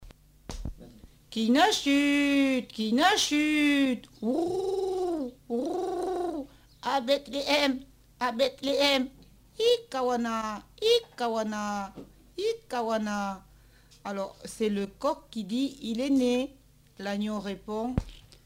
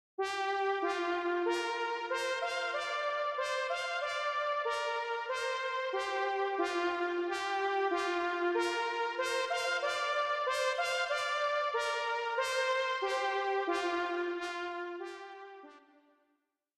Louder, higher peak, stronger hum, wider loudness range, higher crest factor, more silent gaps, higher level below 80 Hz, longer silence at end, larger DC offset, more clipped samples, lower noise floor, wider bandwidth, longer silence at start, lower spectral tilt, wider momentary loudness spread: first, -28 LUFS vs -33 LUFS; first, -8 dBFS vs -20 dBFS; first, 50 Hz at -60 dBFS vs none; first, 8 LU vs 2 LU; first, 20 dB vs 14 dB; neither; first, -52 dBFS vs -78 dBFS; second, 0.25 s vs 1 s; neither; neither; second, -57 dBFS vs -80 dBFS; first, 16 kHz vs 13.5 kHz; second, 0 s vs 0.2 s; first, -4 dB/octave vs -1 dB/octave; first, 14 LU vs 4 LU